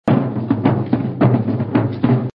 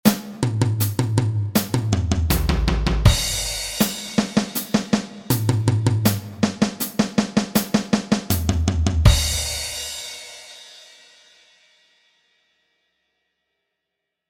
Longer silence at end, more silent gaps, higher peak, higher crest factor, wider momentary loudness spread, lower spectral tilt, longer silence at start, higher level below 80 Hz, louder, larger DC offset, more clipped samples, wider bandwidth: second, 0.05 s vs 3.45 s; neither; about the same, 0 dBFS vs 0 dBFS; about the same, 16 dB vs 20 dB; second, 3 LU vs 8 LU; first, -11 dB/octave vs -5 dB/octave; about the same, 0.05 s vs 0.05 s; second, -48 dBFS vs -30 dBFS; first, -18 LUFS vs -21 LUFS; neither; neither; second, 5 kHz vs 17 kHz